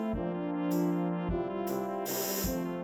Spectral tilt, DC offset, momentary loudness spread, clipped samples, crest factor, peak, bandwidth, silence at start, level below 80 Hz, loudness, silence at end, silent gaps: -5.5 dB/octave; under 0.1%; 4 LU; under 0.1%; 14 dB; -18 dBFS; over 20 kHz; 0 s; -48 dBFS; -33 LUFS; 0 s; none